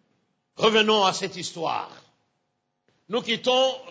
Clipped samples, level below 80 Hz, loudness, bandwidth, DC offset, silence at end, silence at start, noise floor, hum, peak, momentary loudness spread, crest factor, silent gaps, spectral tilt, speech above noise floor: under 0.1%; -72 dBFS; -23 LUFS; 8 kHz; under 0.1%; 0 s; 0.6 s; -77 dBFS; none; -6 dBFS; 12 LU; 20 dB; none; -3 dB/octave; 53 dB